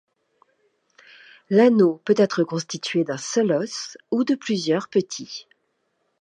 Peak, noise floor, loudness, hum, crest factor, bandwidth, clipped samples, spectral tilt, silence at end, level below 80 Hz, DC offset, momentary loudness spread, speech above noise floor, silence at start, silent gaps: -4 dBFS; -72 dBFS; -22 LUFS; none; 18 dB; 9.8 kHz; under 0.1%; -5 dB/octave; 0.8 s; -76 dBFS; under 0.1%; 15 LU; 51 dB; 1.5 s; none